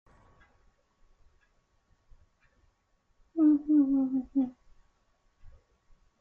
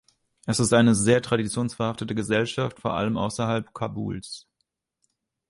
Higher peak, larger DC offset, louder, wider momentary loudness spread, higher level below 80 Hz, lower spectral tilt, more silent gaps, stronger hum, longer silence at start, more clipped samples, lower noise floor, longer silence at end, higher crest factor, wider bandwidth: second, -16 dBFS vs -6 dBFS; neither; second, -27 LUFS vs -24 LUFS; second, 10 LU vs 14 LU; second, -62 dBFS vs -54 dBFS; first, -9.5 dB/octave vs -5 dB/octave; neither; neither; first, 3.35 s vs 0.45 s; neither; second, -72 dBFS vs -78 dBFS; second, 0.75 s vs 1.1 s; about the same, 18 dB vs 20 dB; second, 2 kHz vs 11.5 kHz